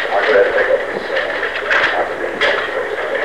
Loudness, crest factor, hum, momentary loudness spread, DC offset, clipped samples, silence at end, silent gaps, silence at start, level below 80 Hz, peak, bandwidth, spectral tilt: -16 LUFS; 12 dB; none; 7 LU; 0.8%; under 0.1%; 0 s; none; 0 s; -50 dBFS; -4 dBFS; 12 kHz; -3 dB/octave